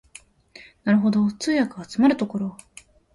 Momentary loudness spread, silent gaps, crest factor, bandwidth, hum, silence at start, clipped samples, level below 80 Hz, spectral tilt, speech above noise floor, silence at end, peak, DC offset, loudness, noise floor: 11 LU; none; 16 dB; 11.5 kHz; none; 0.6 s; under 0.1%; -60 dBFS; -6 dB/octave; 29 dB; 0.65 s; -8 dBFS; under 0.1%; -22 LUFS; -50 dBFS